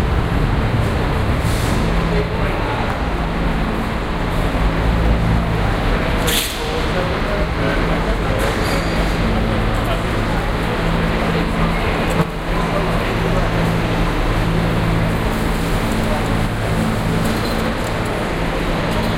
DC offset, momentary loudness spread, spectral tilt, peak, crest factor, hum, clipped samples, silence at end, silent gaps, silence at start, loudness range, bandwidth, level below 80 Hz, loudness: under 0.1%; 3 LU; -6 dB/octave; -2 dBFS; 14 dB; none; under 0.1%; 0 s; none; 0 s; 1 LU; 16.5 kHz; -22 dBFS; -19 LUFS